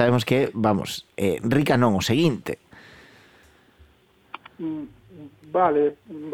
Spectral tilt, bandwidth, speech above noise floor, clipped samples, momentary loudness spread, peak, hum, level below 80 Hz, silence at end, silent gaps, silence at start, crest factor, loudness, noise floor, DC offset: -6 dB/octave; 19.5 kHz; 36 dB; under 0.1%; 18 LU; -4 dBFS; none; -56 dBFS; 0 s; none; 0 s; 20 dB; -23 LUFS; -58 dBFS; under 0.1%